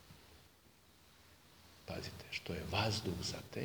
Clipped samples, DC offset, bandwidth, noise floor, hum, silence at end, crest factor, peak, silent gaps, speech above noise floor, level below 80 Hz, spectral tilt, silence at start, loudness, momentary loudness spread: under 0.1%; under 0.1%; over 20 kHz; -66 dBFS; none; 0 s; 24 dB; -20 dBFS; none; 25 dB; -62 dBFS; -4.5 dB/octave; 0 s; -41 LUFS; 26 LU